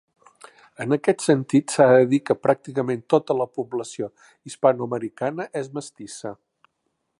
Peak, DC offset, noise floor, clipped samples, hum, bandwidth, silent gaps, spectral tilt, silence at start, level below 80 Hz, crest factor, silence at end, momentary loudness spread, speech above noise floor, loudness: -4 dBFS; under 0.1%; -75 dBFS; under 0.1%; none; 11.5 kHz; none; -6 dB/octave; 0.8 s; -70 dBFS; 20 dB; 0.85 s; 17 LU; 53 dB; -22 LUFS